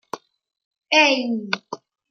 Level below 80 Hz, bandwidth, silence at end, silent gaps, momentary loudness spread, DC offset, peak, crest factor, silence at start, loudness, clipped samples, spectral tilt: -80 dBFS; 9.8 kHz; 0.35 s; 0.65-0.71 s; 22 LU; under 0.1%; -2 dBFS; 20 dB; 0.15 s; -19 LUFS; under 0.1%; -2.5 dB/octave